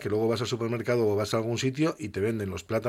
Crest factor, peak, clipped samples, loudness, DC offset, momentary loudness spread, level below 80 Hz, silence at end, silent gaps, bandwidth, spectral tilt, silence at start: 14 dB; -12 dBFS; under 0.1%; -28 LUFS; under 0.1%; 5 LU; -60 dBFS; 0 s; none; 16 kHz; -6 dB/octave; 0 s